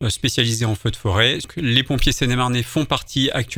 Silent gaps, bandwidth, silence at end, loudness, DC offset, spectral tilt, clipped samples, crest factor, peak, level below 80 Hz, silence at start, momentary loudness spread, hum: none; 19 kHz; 0 s; -19 LUFS; under 0.1%; -4 dB/octave; under 0.1%; 20 dB; 0 dBFS; -32 dBFS; 0 s; 4 LU; none